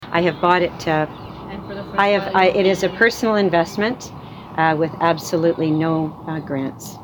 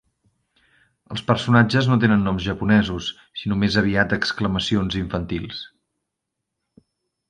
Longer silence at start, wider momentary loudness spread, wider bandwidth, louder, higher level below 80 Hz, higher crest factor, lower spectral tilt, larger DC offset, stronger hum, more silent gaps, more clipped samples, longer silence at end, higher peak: second, 0 s vs 1.1 s; about the same, 15 LU vs 13 LU; first, 19 kHz vs 9.8 kHz; about the same, -19 LUFS vs -21 LUFS; second, -50 dBFS vs -44 dBFS; about the same, 16 dB vs 20 dB; about the same, -5.5 dB/octave vs -6.5 dB/octave; neither; neither; neither; neither; second, 0 s vs 1.65 s; about the same, -2 dBFS vs -2 dBFS